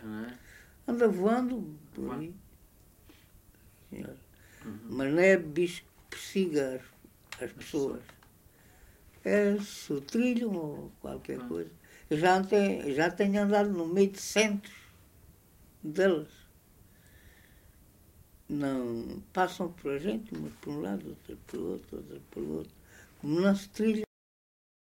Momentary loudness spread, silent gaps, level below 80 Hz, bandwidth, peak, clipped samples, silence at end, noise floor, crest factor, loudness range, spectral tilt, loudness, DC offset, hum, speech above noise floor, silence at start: 19 LU; none; -62 dBFS; 16 kHz; -10 dBFS; under 0.1%; 0.85 s; -60 dBFS; 22 dB; 9 LU; -5.5 dB/octave; -31 LUFS; under 0.1%; none; 29 dB; 0 s